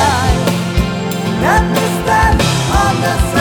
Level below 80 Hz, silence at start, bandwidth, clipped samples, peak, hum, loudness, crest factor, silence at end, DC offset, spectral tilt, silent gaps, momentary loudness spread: -20 dBFS; 0 s; over 20 kHz; under 0.1%; 0 dBFS; none; -13 LUFS; 12 dB; 0 s; under 0.1%; -5 dB/octave; none; 5 LU